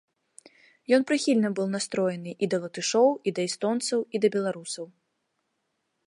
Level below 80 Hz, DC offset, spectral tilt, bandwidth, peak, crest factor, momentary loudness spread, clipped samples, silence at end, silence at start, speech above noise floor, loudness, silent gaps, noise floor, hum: -78 dBFS; under 0.1%; -4.5 dB/octave; 11.5 kHz; -8 dBFS; 18 dB; 11 LU; under 0.1%; 1.2 s; 0.9 s; 52 dB; -26 LUFS; none; -78 dBFS; none